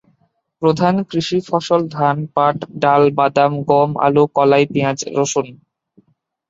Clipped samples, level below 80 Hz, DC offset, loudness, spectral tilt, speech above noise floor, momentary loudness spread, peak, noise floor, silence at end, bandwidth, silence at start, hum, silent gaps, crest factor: under 0.1%; -58 dBFS; under 0.1%; -16 LUFS; -5.5 dB/octave; 47 dB; 6 LU; 0 dBFS; -62 dBFS; 0.95 s; 8 kHz; 0.6 s; none; none; 16 dB